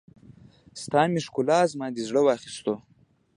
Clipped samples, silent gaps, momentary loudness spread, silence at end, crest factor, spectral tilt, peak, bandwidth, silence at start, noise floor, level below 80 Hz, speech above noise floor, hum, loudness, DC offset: under 0.1%; none; 12 LU; 0.55 s; 20 dB; -5.5 dB/octave; -6 dBFS; 11.5 kHz; 0.75 s; -52 dBFS; -66 dBFS; 27 dB; none; -25 LUFS; under 0.1%